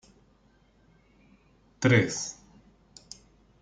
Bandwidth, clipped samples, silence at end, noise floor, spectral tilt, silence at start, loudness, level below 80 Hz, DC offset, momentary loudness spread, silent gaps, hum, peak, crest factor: 9.4 kHz; under 0.1%; 1.3 s; -63 dBFS; -5 dB/octave; 1.8 s; -26 LUFS; -62 dBFS; under 0.1%; 26 LU; none; none; -8 dBFS; 24 dB